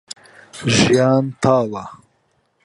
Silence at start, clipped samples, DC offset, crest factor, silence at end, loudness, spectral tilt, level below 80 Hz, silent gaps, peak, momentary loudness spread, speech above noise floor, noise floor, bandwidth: 0.55 s; under 0.1%; under 0.1%; 18 dB; 0.7 s; -16 LUFS; -5 dB/octave; -48 dBFS; none; 0 dBFS; 22 LU; 48 dB; -64 dBFS; 11.5 kHz